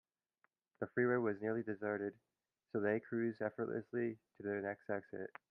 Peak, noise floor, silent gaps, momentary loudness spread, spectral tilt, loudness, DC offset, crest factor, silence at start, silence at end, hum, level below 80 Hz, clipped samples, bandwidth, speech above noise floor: -22 dBFS; -81 dBFS; none; 10 LU; -8 dB/octave; -41 LUFS; under 0.1%; 18 dB; 0.8 s; 0.25 s; none; -86 dBFS; under 0.1%; 4.9 kHz; 41 dB